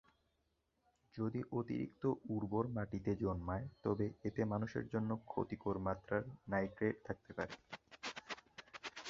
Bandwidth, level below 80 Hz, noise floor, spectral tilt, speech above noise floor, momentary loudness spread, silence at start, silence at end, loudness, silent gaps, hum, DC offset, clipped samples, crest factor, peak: 7.4 kHz; -62 dBFS; -83 dBFS; -6.5 dB/octave; 42 dB; 10 LU; 1.15 s; 0 s; -42 LUFS; none; none; under 0.1%; under 0.1%; 20 dB; -22 dBFS